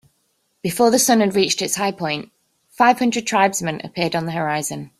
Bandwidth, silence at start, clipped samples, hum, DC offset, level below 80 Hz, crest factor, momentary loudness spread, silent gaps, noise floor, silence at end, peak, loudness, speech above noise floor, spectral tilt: 16 kHz; 0.65 s; under 0.1%; none; under 0.1%; -60 dBFS; 18 dB; 10 LU; none; -67 dBFS; 0.15 s; -2 dBFS; -19 LUFS; 48 dB; -3.5 dB/octave